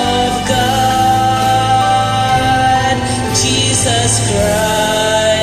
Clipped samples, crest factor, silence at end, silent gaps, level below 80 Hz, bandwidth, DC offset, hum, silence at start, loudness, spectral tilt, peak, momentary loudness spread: under 0.1%; 12 dB; 0 s; none; -32 dBFS; 15 kHz; under 0.1%; none; 0 s; -12 LUFS; -3.5 dB/octave; 0 dBFS; 2 LU